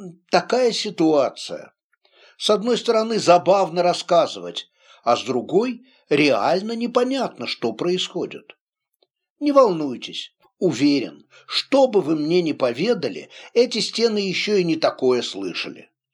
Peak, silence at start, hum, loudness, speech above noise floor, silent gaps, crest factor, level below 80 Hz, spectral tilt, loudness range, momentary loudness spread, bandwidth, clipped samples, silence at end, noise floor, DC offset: -2 dBFS; 0 s; none; -20 LUFS; 48 dB; 1.84-1.90 s, 8.61-8.67 s, 8.96-9.00 s, 9.30-9.36 s; 18 dB; -74 dBFS; -4.5 dB/octave; 3 LU; 13 LU; 11.5 kHz; under 0.1%; 0.35 s; -69 dBFS; under 0.1%